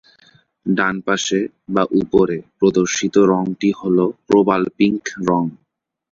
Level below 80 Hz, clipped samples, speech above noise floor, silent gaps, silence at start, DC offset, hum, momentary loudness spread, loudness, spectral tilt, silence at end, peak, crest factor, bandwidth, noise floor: -54 dBFS; under 0.1%; 37 dB; none; 0.65 s; under 0.1%; none; 7 LU; -18 LUFS; -5 dB/octave; 0.6 s; -2 dBFS; 16 dB; 7.6 kHz; -54 dBFS